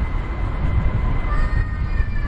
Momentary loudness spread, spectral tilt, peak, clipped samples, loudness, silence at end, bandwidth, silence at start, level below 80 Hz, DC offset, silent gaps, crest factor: 4 LU; -8.5 dB/octave; -6 dBFS; under 0.1%; -24 LUFS; 0 s; 5.2 kHz; 0 s; -20 dBFS; under 0.1%; none; 12 dB